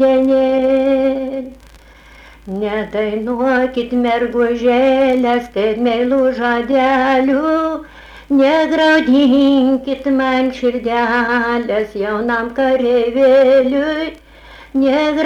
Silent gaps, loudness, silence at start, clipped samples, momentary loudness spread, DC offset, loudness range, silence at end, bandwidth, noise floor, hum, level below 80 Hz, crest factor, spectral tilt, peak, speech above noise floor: none; -14 LUFS; 0 s; under 0.1%; 8 LU; under 0.1%; 5 LU; 0 s; 8.2 kHz; -42 dBFS; none; -44 dBFS; 10 dB; -5.5 dB/octave; -4 dBFS; 28 dB